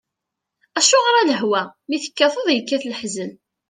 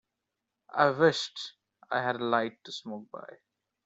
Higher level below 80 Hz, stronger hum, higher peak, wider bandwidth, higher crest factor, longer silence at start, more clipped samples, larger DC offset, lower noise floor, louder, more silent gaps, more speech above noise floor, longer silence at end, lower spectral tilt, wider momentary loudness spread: about the same, -76 dBFS vs -76 dBFS; neither; first, -2 dBFS vs -8 dBFS; first, 10 kHz vs 8 kHz; second, 18 dB vs 24 dB; about the same, 0.75 s vs 0.75 s; neither; neither; second, -82 dBFS vs -86 dBFS; first, -18 LUFS vs -29 LUFS; neither; first, 63 dB vs 56 dB; second, 0.35 s vs 0.5 s; second, -1.5 dB/octave vs -4.5 dB/octave; second, 14 LU vs 18 LU